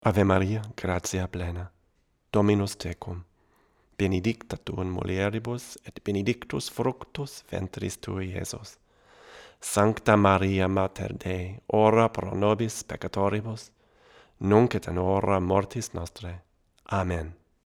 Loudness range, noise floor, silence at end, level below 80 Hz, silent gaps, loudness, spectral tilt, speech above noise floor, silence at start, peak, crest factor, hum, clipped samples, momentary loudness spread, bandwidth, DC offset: 8 LU; -69 dBFS; 0.35 s; -50 dBFS; none; -27 LUFS; -6 dB/octave; 43 dB; 0.05 s; -6 dBFS; 22 dB; none; under 0.1%; 16 LU; 16 kHz; under 0.1%